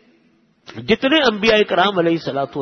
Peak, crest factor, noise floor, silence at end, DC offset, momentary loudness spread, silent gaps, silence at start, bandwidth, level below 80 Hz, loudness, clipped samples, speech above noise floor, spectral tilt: -2 dBFS; 16 dB; -58 dBFS; 0 s; under 0.1%; 11 LU; none; 0.7 s; 6.6 kHz; -50 dBFS; -16 LUFS; under 0.1%; 41 dB; -5 dB/octave